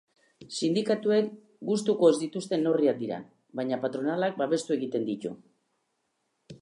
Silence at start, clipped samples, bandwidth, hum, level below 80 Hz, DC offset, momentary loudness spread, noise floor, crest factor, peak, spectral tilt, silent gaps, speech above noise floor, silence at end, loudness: 0.4 s; under 0.1%; 11.5 kHz; none; -78 dBFS; under 0.1%; 15 LU; -77 dBFS; 20 dB; -8 dBFS; -5.5 dB/octave; none; 50 dB; 0.05 s; -28 LUFS